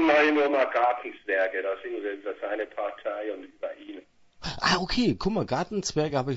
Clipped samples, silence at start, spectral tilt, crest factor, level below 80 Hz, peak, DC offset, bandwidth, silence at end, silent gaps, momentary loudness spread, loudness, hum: under 0.1%; 0 s; -4.5 dB/octave; 18 dB; -50 dBFS; -10 dBFS; under 0.1%; 8 kHz; 0 s; none; 14 LU; -27 LUFS; none